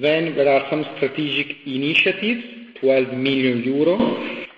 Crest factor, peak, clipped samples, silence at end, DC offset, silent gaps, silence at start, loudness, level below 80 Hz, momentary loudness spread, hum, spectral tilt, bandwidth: 16 dB; -4 dBFS; under 0.1%; 0.1 s; under 0.1%; none; 0 s; -20 LUFS; -58 dBFS; 8 LU; none; -7 dB/octave; 7.8 kHz